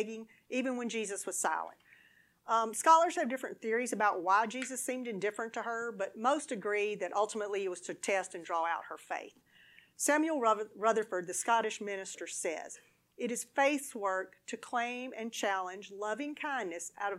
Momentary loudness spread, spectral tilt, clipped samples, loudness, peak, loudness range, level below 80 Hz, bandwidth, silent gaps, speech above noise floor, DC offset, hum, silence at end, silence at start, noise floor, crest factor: 11 LU; -2.5 dB/octave; under 0.1%; -34 LUFS; -12 dBFS; 5 LU; -88 dBFS; 16 kHz; none; 32 dB; under 0.1%; none; 0 s; 0 s; -66 dBFS; 22 dB